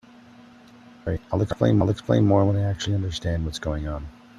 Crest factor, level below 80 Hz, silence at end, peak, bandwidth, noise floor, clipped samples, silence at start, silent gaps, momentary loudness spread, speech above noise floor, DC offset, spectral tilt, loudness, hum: 18 dB; -42 dBFS; 0.3 s; -6 dBFS; 10.5 kHz; -49 dBFS; under 0.1%; 1.05 s; none; 12 LU; 26 dB; under 0.1%; -7 dB/octave; -24 LUFS; none